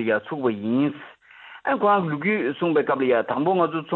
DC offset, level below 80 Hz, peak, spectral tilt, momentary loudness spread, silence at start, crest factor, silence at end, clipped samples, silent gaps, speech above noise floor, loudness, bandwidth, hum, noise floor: under 0.1%; -68 dBFS; -8 dBFS; -10 dB/octave; 6 LU; 0 s; 16 dB; 0 s; under 0.1%; none; 24 dB; -23 LUFS; 4.3 kHz; none; -46 dBFS